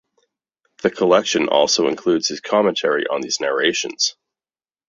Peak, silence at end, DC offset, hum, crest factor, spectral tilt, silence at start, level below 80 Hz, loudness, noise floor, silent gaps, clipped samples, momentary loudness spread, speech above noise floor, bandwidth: -2 dBFS; 0.75 s; under 0.1%; none; 18 dB; -2.5 dB/octave; 0.85 s; -64 dBFS; -18 LUFS; under -90 dBFS; none; under 0.1%; 5 LU; over 72 dB; 7.8 kHz